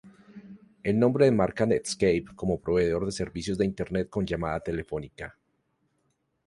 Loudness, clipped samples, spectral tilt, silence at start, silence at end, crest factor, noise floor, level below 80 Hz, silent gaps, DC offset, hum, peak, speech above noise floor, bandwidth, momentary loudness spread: -27 LUFS; under 0.1%; -6 dB/octave; 0.05 s; 1.15 s; 20 dB; -74 dBFS; -50 dBFS; none; under 0.1%; none; -8 dBFS; 48 dB; 11.5 kHz; 13 LU